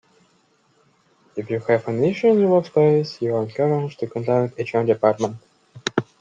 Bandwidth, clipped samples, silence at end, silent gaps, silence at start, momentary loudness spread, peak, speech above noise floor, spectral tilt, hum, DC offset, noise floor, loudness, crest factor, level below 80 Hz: 7.6 kHz; under 0.1%; 0.2 s; none; 1.35 s; 10 LU; -2 dBFS; 42 dB; -7 dB/octave; none; under 0.1%; -61 dBFS; -21 LUFS; 18 dB; -64 dBFS